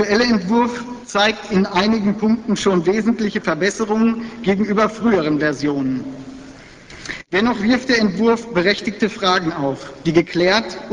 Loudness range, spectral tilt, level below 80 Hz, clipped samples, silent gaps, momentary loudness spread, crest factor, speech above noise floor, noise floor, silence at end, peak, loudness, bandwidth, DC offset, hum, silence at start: 3 LU; -5 dB/octave; -48 dBFS; under 0.1%; none; 8 LU; 18 dB; 22 dB; -40 dBFS; 0 s; 0 dBFS; -18 LUFS; 10 kHz; under 0.1%; none; 0 s